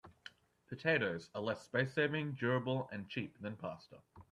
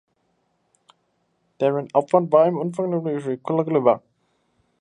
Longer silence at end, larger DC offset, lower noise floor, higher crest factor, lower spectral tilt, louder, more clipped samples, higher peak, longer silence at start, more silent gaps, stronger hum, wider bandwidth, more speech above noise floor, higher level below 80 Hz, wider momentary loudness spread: second, 0.1 s vs 0.8 s; neither; second, -60 dBFS vs -69 dBFS; about the same, 20 dB vs 20 dB; second, -6.5 dB/octave vs -8.5 dB/octave; second, -38 LUFS vs -21 LUFS; neither; second, -18 dBFS vs -2 dBFS; second, 0.05 s vs 1.6 s; neither; neither; about the same, 11 kHz vs 10 kHz; second, 21 dB vs 49 dB; about the same, -76 dBFS vs -74 dBFS; first, 19 LU vs 8 LU